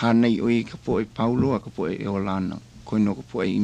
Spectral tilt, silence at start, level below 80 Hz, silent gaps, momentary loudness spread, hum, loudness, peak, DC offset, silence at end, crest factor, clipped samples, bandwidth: -8 dB/octave; 0 s; -50 dBFS; none; 8 LU; none; -24 LUFS; -8 dBFS; under 0.1%; 0 s; 16 dB; under 0.1%; 9 kHz